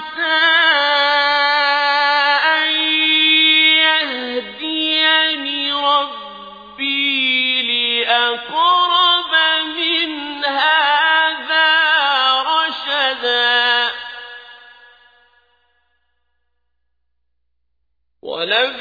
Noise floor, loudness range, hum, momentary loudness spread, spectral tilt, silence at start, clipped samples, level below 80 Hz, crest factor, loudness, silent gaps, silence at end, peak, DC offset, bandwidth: -75 dBFS; 6 LU; none; 11 LU; -2 dB/octave; 0 s; under 0.1%; -62 dBFS; 16 dB; -14 LUFS; none; 0 s; 0 dBFS; under 0.1%; 5 kHz